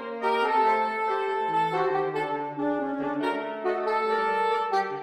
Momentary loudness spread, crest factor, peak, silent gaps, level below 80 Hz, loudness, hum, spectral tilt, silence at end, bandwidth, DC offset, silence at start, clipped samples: 6 LU; 14 dB; -12 dBFS; none; -82 dBFS; -26 LUFS; none; -5.5 dB/octave; 0 s; 12 kHz; under 0.1%; 0 s; under 0.1%